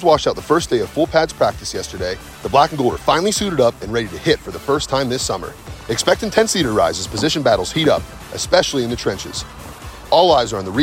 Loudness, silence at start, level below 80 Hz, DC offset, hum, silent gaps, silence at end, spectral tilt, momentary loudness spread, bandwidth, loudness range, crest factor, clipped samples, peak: -18 LUFS; 0 s; -38 dBFS; under 0.1%; none; none; 0 s; -4 dB/octave; 11 LU; 16.5 kHz; 2 LU; 18 dB; under 0.1%; 0 dBFS